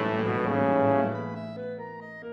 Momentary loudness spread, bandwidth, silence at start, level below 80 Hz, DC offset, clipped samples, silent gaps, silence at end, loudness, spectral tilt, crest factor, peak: 15 LU; 6.2 kHz; 0 s; -64 dBFS; under 0.1%; under 0.1%; none; 0 s; -27 LUFS; -9 dB/octave; 16 dB; -10 dBFS